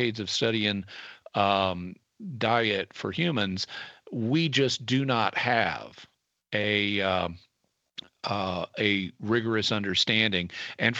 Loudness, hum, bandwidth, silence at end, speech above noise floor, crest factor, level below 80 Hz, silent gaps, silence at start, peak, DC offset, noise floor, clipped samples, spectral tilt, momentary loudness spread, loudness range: -27 LUFS; none; 8.4 kHz; 0 s; 49 dB; 20 dB; -64 dBFS; none; 0 s; -8 dBFS; under 0.1%; -77 dBFS; under 0.1%; -4.5 dB/octave; 14 LU; 2 LU